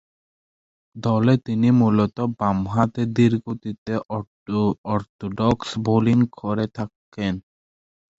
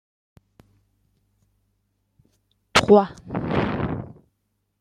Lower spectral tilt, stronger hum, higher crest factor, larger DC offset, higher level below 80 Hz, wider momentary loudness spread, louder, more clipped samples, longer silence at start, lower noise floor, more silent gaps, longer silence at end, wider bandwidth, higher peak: first, -8 dB/octave vs -5 dB/octave; second, none vs 50 Hz at -45 dBFS; about the same, 20 dB vs 24 dB; neither; about the same, -50 dBFS vs -50 dBFS; second, 13 LU vs 16 LU; about the same, -22 LUFS vs -21 LUFS; neither; second, 0.95 s vs 2.75 s; first, under -90 dBFS vs -74 dBFS; first, 3.78-3.86 s, 4.27-4.46 s, 4.78-4.84 s, 5.09-5.19 s, 6.96-7.12 s vs none; about the same, 0.8 s vs 0.7 s; second, 8 kHz vs 15 kHz; about the same, -2 dBFS vs -2 dBFS